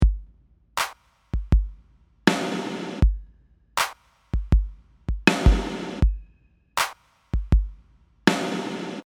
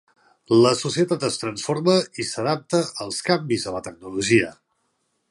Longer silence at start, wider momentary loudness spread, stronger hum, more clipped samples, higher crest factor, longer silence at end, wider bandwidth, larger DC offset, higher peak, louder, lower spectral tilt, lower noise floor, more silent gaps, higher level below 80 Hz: second, 0 s vs 0.5 s; about the same, 12 LU vs 10 LU; neither; neither; about the same, 24 dB vs 20 dB; second, 0.05 s vs 0.75 s; first, 17.5 kHz vs 11.5 kHz; neither; first, 0 dBFS vs -4 dBFS; second, -25 LUFS vs -22 LUFS; about the same, -5 dB/octave vs -4.5 dB/octave; second, -59 dBFS vs -71 dBFS; neither; first, -26 dBFS vs -60 dBFS